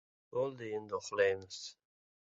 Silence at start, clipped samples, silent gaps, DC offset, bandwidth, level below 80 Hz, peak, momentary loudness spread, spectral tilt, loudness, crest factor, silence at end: 0.3 s; under 0.1%; none; under 0.1%; 8 kHz; -74 dBFS; -18 dBFS; 14 LU; -2.5 dB/octave; -37 LUFS; 20 dB; 0.6 s